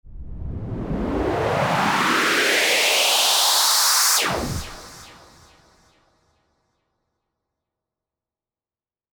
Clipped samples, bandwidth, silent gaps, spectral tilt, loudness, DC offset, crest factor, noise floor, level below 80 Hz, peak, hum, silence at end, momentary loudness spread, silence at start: under 0.1%; over 20 kHz; none; -1.5 dB/octave; -17 LUFS; under 0.1%; 16 dB; under -90 dBFS; -42 dBFS; -6 dBFS; none; 4 s; 17 LU; 0.05 s